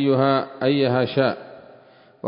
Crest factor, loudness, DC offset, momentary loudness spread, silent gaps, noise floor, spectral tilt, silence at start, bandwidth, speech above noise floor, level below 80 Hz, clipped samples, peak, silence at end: 16 dB; -20 LUFS; under 0.1%; 5 LU; none; -51 dBFS; -11.5 dB/octave; 0 s; 5.4 kHz; 31 dB; -64 dBFS; under 0.1%; -6 dBFS; 0 s